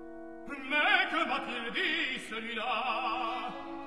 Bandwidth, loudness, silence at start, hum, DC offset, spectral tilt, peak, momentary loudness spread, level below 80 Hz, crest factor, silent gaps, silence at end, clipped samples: 13 kHz; -31 LUFS; 0 s; none; 0.3%; -3 dB/octave; -12 dBFS; 15 LU; -64 dBFS; 20 dB; none; 0 s; under 0.1%